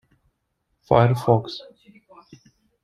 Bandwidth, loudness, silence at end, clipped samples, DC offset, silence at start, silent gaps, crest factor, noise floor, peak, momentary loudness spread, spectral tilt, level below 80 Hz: 12.5 kHz; -20 LUFS; 1.25 s; under 0.1%; under 0.1%; 0.9 s; none; 22 dB; -74 dBFS; -2 dBFS; 18 LU; -8 dB/octave; -52 dBFS